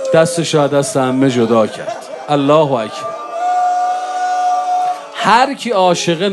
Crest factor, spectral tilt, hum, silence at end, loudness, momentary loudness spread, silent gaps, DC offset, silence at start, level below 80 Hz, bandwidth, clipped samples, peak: 14 dB; -5 dB/octave; none; 0 s; -14 LUFS; 9 LU; none; under 0.1%; 0 s; -62 dBFS; 12.5 kHz; under 0.1%; 0 dBFS